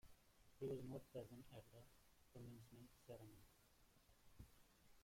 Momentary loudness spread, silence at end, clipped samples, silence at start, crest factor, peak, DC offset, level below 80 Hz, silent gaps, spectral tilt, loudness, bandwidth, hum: 16 LU; 0 s; under 0.1%; 0.05 s; 20 dB; -40 dBFS; under 0.1%; -76 dBFS; none; -6.5 dB/octave; -58 LUFS; 16.5 kHz; none